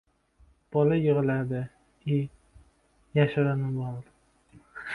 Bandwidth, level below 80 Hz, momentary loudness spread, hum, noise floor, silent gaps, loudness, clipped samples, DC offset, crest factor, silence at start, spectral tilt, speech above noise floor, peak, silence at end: 4.4 kHz; -60 dBFS; 17 LU; none; -64 dBFS; none; -28 LUFS; under 0.1%; under 0.1%; 20 dB; 0.7 s; -9.5 dB/octave; 39 dB; -8 dBFS; 0 s